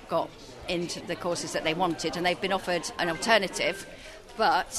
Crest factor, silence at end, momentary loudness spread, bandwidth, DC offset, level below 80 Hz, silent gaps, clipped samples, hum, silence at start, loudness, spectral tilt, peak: 22 dB; 0 s; 15 LU; 13.5 kHz; under 0.1%; -54 dBFS; none; under 0.1%; none; 0 s; -28 LUFS; -3 dB/octave; -6 dBFS